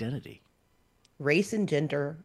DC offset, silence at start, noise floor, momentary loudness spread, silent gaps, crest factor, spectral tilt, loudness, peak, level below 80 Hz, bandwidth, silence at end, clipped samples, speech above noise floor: under 0.1%; 0 s; -68 dBFS; 13 LU; none; 20 dB; -6 dB/octave; -29 LUFS; -10 dBFS; -68 dBFS; 12.5 kHz; 0 s; under 0.1%; 39 dB